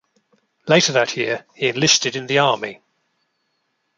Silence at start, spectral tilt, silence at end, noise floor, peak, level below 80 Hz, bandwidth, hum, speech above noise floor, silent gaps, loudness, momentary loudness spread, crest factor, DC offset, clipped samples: 0.65 s; -2.5 dB/octave; 1.25 s; -71 dBFS; -2 dBFS; -64 dBFS; 11 kHz; none; 52 dB; none; -17 LUFS; 10 LU; 20 dB; under 0.1%; under 0.1%